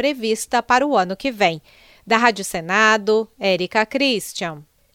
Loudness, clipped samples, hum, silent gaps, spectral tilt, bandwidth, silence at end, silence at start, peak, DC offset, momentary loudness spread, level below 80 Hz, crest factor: -19 LUFS; under 0.1%; none; none; -3.5 dB/octave; 17 kHz; 0.35 s; 0 s; 0 dBFS; under 0.1%; 10 LU; -56 dBFS; 20 dB